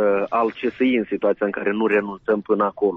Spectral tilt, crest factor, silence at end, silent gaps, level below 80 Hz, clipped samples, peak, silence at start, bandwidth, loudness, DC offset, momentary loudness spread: -4.5 dB/octave; 14 dB; 0 s; none; -62 dBFS; under 0.1%; -8 dBFS; 0 s; 5.4 kHz; -21 LUFS; under 0.1%; 3 LU